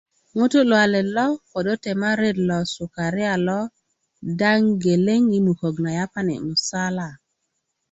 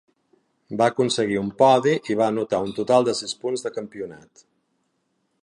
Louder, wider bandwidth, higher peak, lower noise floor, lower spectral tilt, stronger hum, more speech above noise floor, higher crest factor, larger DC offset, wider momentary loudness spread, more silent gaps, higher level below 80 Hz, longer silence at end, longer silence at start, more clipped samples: about the same, -21 LUFS vs -22 LUFS; second, 8.2 kHz vs 11.5 kHz; about the same, -4 dBFS vs -4 dBFS; about the same, -75 dBFS vs -72 dBFS; about the same, -5.5 dB/octave vs -5 dB/octave; neither; first, 55 dB vs 50 dB; about the same, 18 dB vs 20 dB; neither; second, 10 LU vs 16 LU; neither; first, -58 dBFS vs -64 dBFS; second, 0.75 s vs 1.25 s; second, 0.35 s vs 0.7 s; neither